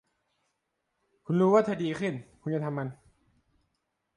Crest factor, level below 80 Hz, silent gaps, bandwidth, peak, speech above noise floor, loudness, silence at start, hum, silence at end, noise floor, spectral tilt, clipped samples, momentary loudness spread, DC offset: 20 dB; -70 dBFS; none; 10.5 kHz; -12 dBFS; 53 dB; -28 LUFS; 1.3 s; none; 1.25 s; -80 dBFS; -8 dB/octave; under 0.1%; 14 LU; under 0.1%